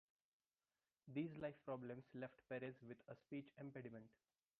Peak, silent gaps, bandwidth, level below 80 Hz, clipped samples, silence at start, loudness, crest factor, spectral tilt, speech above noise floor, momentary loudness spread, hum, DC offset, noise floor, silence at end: -34 dBFS; none; 5.4 kHz; -86 dBFS; under 0.1%; 1.05 s; -54 LUFS; 20 dB; -6.5 dB/octave; over 37 dB; 10 LU; none; under 0.1%; under -90 dBFS; 0.5 s